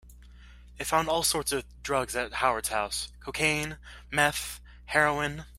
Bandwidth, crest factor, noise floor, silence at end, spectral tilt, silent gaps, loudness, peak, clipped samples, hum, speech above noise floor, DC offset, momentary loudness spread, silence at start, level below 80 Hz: 16 kHz; 22 dB; -50 dBFS; 0 s; -2.5 dB/octave; none; -28 LUFS; -6 dBFS; under 0.1%; 60 Hz at -50 dBFS; 21 dB; under 0.1%; 11 LU; 0.05 s; -50 dBFS